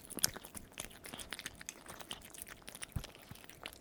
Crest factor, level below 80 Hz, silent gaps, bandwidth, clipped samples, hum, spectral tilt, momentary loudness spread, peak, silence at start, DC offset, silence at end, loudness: 40 dB; -58 dBFS; none; over 20 kHz; under 0.1%; none; -1.5 dB/octave; 14 LU; -6 dBFS; 0 s; under 0.1%; 0 s; -44 LUFS